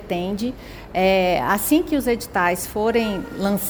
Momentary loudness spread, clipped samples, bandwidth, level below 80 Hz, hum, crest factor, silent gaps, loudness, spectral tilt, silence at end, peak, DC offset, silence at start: 9 LU; under 0.1%; over 20 kHz; -42 dBFS; none; 16 dB; none; -21 LUFS; -4.5 dB/octave; 0 s; -6 dBFS; under 0.1%; 0 s